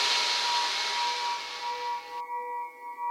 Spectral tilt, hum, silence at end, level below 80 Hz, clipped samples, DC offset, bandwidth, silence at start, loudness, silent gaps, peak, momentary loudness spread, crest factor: 3 dB/octave; none; 0 s; -78 dBFS; under 0.1%; under 0.1%; 16 kHz; 0 s; -29 LUFS; none; -12 dBFS; 12 LU; 18 dB